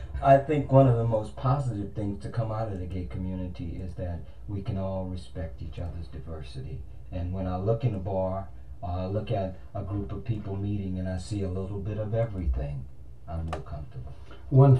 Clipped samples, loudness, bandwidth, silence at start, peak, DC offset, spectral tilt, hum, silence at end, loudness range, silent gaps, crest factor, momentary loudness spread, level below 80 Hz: under 0.1%; -30 LUFS; 9.4 kHz; 0 s; -6 dBFS; 0.8%; -9 dB/octave; none; 0 s; 8 LU; none; 22 dB; 18 LU; -42 dBFS